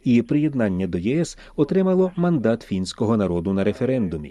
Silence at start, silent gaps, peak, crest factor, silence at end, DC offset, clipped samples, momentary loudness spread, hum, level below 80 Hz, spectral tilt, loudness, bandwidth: 0.05 s; none; -6 dBFS; 14 dB; 0 s; under 0.1%; under 0.1%; 6 LU; none; -48 dBFS; -7.5 dB/octave; -22 LUFS; 11 kHz